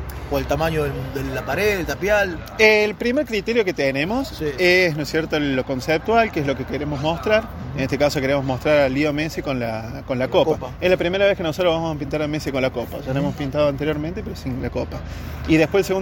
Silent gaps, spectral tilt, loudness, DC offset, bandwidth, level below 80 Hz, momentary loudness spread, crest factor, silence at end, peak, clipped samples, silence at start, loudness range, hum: none; -5.5 dB/octave; -21 LUFS; under 0.1%; 17 kHz; -38 dBFS; 10 LU; 20 dB; 0 s; 0 dBFS; under 0.1%; 0 s; 4 LU; none